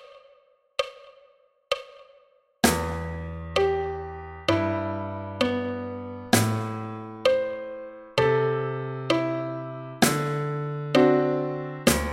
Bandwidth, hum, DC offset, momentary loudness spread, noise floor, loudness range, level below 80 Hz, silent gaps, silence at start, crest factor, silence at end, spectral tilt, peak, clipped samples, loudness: 16 kHz; none; under 0.1%; 13 LU; -60 dBFS; 4 LU; -46 dBFS; none; 0 s; 22 dB; 0 s; -5 dB/octave; -4 dBFS; under 0.1%; -26 LUFS